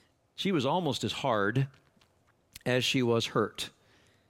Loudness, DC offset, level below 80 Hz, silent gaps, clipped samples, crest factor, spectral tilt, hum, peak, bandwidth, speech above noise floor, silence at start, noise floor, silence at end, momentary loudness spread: -30 LUFS; under 0.1%; -68 dBFS; none; under 0.1%; 18 dB; -5 dB/octave; none; -14 dBFS; 16.5 kHz; 39 dB; 0.4 s; -68 dBFS; 0.6 s; 11 LU